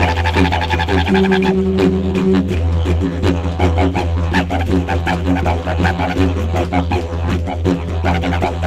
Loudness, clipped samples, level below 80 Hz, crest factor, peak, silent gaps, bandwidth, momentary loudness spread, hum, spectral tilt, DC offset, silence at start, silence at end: -16 LUFS; under 0.1%; -24 dBFS; 14 dB; -2 dBFS; none; 9.4 kHz; 4 LU; none; -7 dB/octave; under 0.1%; 0 s; 0 s